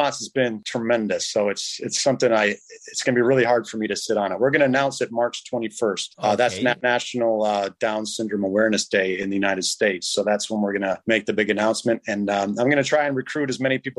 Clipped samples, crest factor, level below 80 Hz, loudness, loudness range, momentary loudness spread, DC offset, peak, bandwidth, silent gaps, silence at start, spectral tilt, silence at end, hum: under 0.1%; 18 dB; -66 dBFS; -22 LUFS; 1 LU; 6 LU; under 0.1%; -4 dBFS; 12.5 kHz; none; 0 s; -3.5 dB/octave; 0.05 s; none